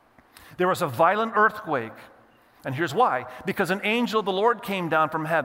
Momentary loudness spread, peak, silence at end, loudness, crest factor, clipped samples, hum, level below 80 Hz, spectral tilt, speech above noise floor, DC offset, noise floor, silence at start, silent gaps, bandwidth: 8 LU; -6 dBFS; 0 s; -24 LUFS; 18 dB; under 0.1%; none; -68 dBFS; -5.5 dB/octave; 32 dB; under 0.1%; -56 dBFS; 0.45 s; none; 16 kHz